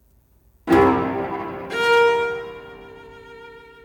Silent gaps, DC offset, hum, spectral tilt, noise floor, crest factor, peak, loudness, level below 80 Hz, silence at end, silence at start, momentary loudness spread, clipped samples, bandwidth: none; under 0.1%; none; -5.5 dB/octave; -57 dBFS; 18 dB; -4 dBFS; -19 LUFS; -48 dBFS; 0.25 s; 0.65 s; 25 LU; under 0.1%; 19 kHz